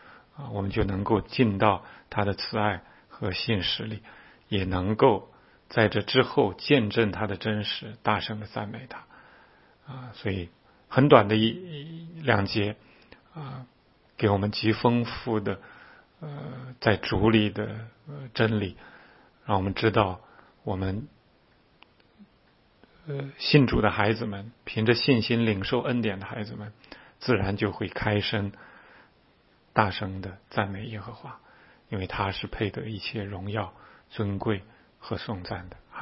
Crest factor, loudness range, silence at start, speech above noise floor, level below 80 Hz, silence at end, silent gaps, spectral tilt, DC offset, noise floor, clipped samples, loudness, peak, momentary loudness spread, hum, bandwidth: 28 dB; 8 LU; 0.05 s; 36 dB; -50 dBFS; 0 s; none; -10 dB/octave; under 0.1%; -62 dBFS; under 0.1%; -27 LUFS; 0 dBFS; 19 LU; none; 5.8 kHz